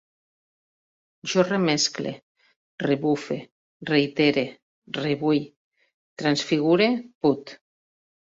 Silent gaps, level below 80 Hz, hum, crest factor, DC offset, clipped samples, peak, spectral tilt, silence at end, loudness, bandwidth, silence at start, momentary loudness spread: 2.22-2.35 s, 2.56-2.78 s, 3.51-3.80 s, 4.62-4.82 s, 5.56-5.71 s, 5.94-6.17 s, 7.15-7.21 s; -66 dBFS; none; 18 dB; under 0.1%; under 0.1%; -6 dBFS; -4.5 dB/octave; 0.8 s; -24 LUFS; 7.8 kHz; 1.25 s; 13 LU